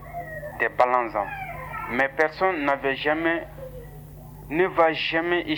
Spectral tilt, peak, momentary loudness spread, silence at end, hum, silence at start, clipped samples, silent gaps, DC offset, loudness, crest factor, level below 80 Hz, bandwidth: -6 dB/octave; -6 dBFS; 19 LU; 0 s; 50 Hz at -45 dBFS; 0 s; under 0.1%; none; under 0.1%; -24 LUFS; 20 dB; -48 dBFS; over 20 kHz